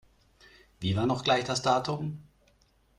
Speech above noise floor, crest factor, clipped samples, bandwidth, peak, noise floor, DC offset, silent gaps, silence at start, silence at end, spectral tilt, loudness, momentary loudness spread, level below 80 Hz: 38 dB; 20 dB; under 0.1%; 13 kHz; -12 dBFS; -66 dBFS; under 0.1%; none; 0.8 s; 0.75 s; -5 dB/octave; -29 LUFS; 11 LU; -60 dBFS